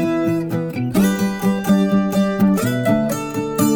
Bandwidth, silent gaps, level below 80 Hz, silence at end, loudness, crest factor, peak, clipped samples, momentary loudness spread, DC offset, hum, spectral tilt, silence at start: 20 kHz; none; -46 dBFS; 0 s; -18 LUFS; 14 dB; -4 dBFS; under 0.1%; 6 LU; under 0.1%; none; -6.5 dB/octave; 0 s